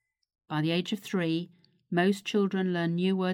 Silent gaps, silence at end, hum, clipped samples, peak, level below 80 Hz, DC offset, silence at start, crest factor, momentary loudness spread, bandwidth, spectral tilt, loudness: none; 0 s; none; under 0.1%; -12 dBFS; -76 dBFS; under 0.1%; 0.5 s; 16 dB; 6 LU; 16 kHz; -6.5 dB/octave; -29 LUFS